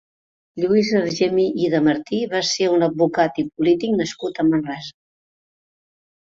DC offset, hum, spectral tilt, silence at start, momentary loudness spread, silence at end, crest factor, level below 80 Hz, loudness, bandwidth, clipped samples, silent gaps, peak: under 0.1%; none; -5 dB/octave; 0.55 s; 8 LU; 1.3 s; 16 dB; -60 dBFS; -20 LUFS; 7.8 kHz; under 0.1%; none; -4 dBFS